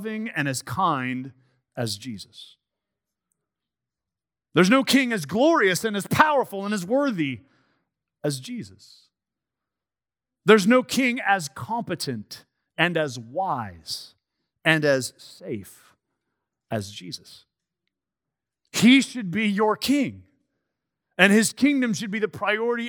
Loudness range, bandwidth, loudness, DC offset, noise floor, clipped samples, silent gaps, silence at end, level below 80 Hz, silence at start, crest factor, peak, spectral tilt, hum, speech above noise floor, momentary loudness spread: 12 LU; over 20 kHz; -22 LUFS; under 0.1%; under -90 dBFS; under 0.1%; none; 0 s; -70 dBFS; 0 s; 24 dB; 0 dBFS; -4.5 dB/octave; none; over 67 dB; 19 LU